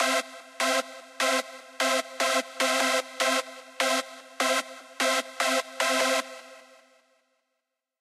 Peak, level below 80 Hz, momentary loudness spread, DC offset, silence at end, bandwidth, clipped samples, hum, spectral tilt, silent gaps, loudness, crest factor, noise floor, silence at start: -12 dBFS; under -90 dBFS; 17 LU; under 0.1%; 1.4 s; 15 kHz; under 0.1%; none; 1.5 dB/octave; none; -26 LUFS; 18 dB; -82 dBFS; 0 s